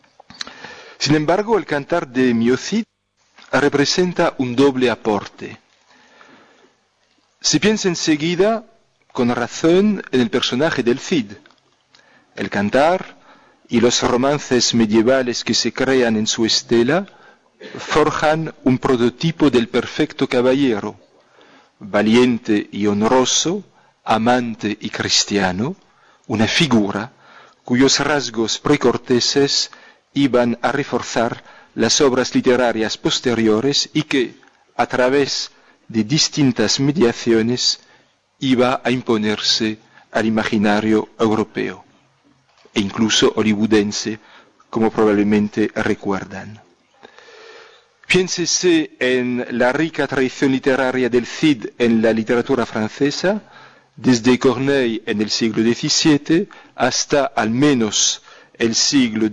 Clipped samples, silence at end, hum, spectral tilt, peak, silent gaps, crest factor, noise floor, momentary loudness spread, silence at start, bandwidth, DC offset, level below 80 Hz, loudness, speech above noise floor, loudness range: under 0.1%; 0 s; none; -4 dB/octave; -6 dBFS; none; 12 dB; -61 dBFS; 10 LU; 0.4 s; 10.5 kHz; under 0.1%; -50 dBFS; -17 LUFS; 44 dB; 3 LU